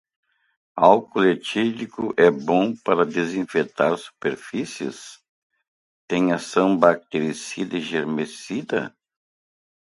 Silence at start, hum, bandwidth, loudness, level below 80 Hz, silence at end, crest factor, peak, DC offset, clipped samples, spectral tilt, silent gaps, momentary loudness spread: 0.75 s; none; 11.5 kHz; -22 LUFS; -66 dBFS; 0.9 s; 22 dB; 0 dBFS; under 0.1%; under 0.1%; -5.5 dB/octave; 5.29-5.50 s, 5.68-6.08 s; 12 LU